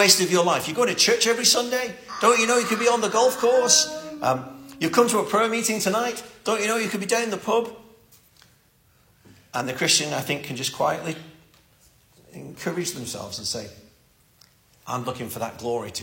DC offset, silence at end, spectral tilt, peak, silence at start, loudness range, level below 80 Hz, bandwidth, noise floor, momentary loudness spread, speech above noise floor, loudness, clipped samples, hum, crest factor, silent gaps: under 0.1%; 0 s; -2 dB/octave; -2 dBFS; 0 s; 12 LU; -64 dBFS; 16.5 kHz; -60 dBFS; 14 LU; 38 dB; -22 LUFS; under 0.1%; none; 22 dB; none